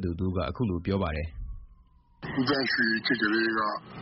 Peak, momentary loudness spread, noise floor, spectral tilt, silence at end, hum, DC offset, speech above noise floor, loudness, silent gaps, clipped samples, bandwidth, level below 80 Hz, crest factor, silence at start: -12 dBFS; 13 LU; -58 dBFS; -3.5 dB/octave; 0 s; none; under 0.1%; 30 dB; -28 LUFS; none; under 0.1%; 6 kHz; -44 dBFS; 16 dB; 0 s